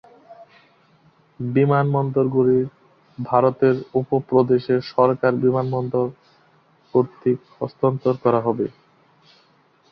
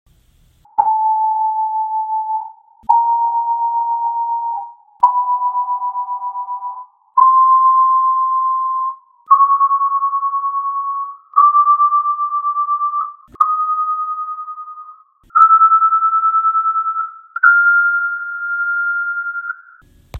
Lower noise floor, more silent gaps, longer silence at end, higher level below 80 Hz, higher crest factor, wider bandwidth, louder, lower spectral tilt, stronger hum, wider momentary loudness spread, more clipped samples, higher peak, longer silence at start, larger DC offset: first, -58 dBFS vs -53 dBFS; neither; first, 1.2 s vs 0 s; about the same, -60 dBFS vs -60 dBFS; about the same, 20 dB vs 16 dB; first, 5.8 kHz vs 4 kHz; second, -20 LUFS vs -15 LUFS; first, -10.5 dB/octave vs -4 dB/octave; neither; second, 8 LU vs 15 LU; neither; about the same, -2 dBFS vs 0 dBFS; second, 0.3 s vs 0.8 s; neither